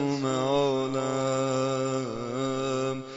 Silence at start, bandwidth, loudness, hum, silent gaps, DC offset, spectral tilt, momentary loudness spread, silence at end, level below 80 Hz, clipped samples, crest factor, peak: 0 s; 7.6 kHz; -28 LUFS; none; none; under 0.1%; -5.5 dB/octave; 5 LU; 0 s; -60 dBFS; under 0.1%; 14 dB; -14 dBFS